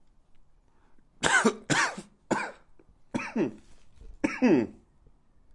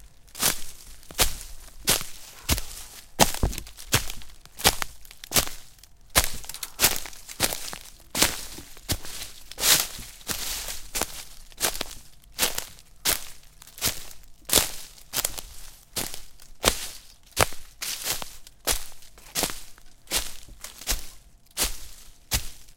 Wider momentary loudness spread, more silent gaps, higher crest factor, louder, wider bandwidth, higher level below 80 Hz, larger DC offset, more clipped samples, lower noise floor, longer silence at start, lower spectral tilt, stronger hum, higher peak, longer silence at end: second, 14 LU vs 20 LU; neither; second, 24 dB vs 30 dB; about the same, -28 LUFS vs -26 LUFS; second, 11.5 kHz vs 17 kHz; second, -58 dBFS vs -40 dBFS; neither; neither; first, -59 dBFS vs -48 dBFS; first, 1.2 s vs 0 s; first, -3.5 dB/octave vs -1.5 dB/octave; neither; second, -6 dBFS vs 0 dBFS; first, 0.85 s vs 0 s